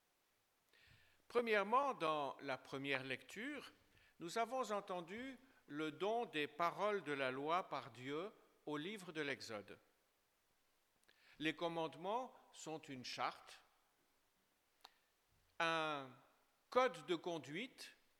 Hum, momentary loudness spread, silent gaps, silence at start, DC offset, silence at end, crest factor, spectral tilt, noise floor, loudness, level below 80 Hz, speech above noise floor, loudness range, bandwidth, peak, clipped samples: none; 16 LU; none; 1.3 s; under 0.1%; 0.25 s; 24 dB; -4 dB/octave; -82 dBFS; -44 LUFS; -88 dBFS; 38 dB; 7 LU; 18 kHz; -22 dBFS; under 0.1%